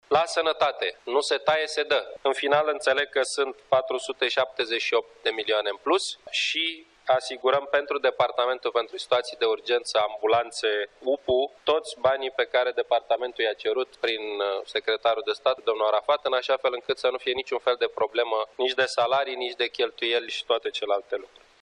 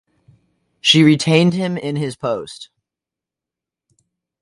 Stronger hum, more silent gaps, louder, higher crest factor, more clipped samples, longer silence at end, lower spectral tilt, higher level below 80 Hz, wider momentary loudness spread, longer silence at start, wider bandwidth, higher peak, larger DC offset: neither; neither; second, -25 LUFS vs -16 LUFS; about the same, 18 dB vs 20 dB; neither; second, 0.35 s vs 1.75 s; second, -2 dB/octave vs -5 dB/octave; second, -68 dBFS vs -62 dBFS; second, 4 LU vs 14 LU; second, 0.1 s vs 0.85 s; about the same, 11 kHz vs 11.5 kHz; second, -8 dBFS vs 0 dBFS; neither